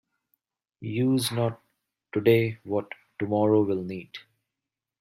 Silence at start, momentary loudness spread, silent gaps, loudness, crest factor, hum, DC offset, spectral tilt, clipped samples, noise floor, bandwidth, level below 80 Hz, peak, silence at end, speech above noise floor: 0.8 s; 18 LU; none; -26 LUFS; 20 dB; none; under 0.1%; -6.5 dB/octave; under 0.1%; -88 dBFS; 16 kHz; -68 dBFS; -8 dBFS; 0.8 s; 63 dB